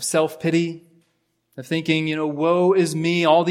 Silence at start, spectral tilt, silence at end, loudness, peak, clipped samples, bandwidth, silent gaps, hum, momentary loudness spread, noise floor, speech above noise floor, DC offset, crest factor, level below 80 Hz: 0 s; -5 dB/octave; 0 s; -20 LUFS; -4 dBFS; under 0.1%; 16 kHz; none; none; 11 LU; -69 dBFS; 49 dB; under 0.1%; 18 dB; -70 dBFS